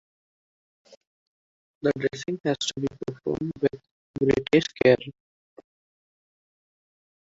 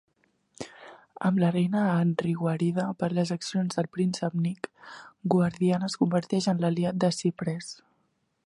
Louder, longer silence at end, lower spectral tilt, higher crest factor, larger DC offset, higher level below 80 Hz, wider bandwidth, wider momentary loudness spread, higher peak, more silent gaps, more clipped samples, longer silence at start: about the same, -25 LUFS vs -27 LUFS; first, 2.1 s vs 0.7 s; about the same, -5.5 dB/octave vs -6.5 dB/octave; about the same, 24 dB vs 20 dB; neither; first, -58 dBFS vs -68 dBFS; second, 8 kHz vs 11.5 kHz; second, 11 LU vs 17 LU; first, -4 dBFS vs -8 dBFS; first, 3.91-4.14 s vs none; neither; first, 1.85 s vs 0.6 s